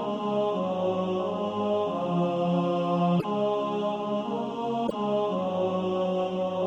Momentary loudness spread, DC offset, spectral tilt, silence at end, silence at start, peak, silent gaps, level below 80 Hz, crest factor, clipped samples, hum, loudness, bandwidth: 4 LU; under 0.1%; -8 dB/octave; 0 s; 0 s; -14 dBFS; none; -66 dBFS; 12 dB; under 0.1%; none; -28 LUFS; 7.8 kHz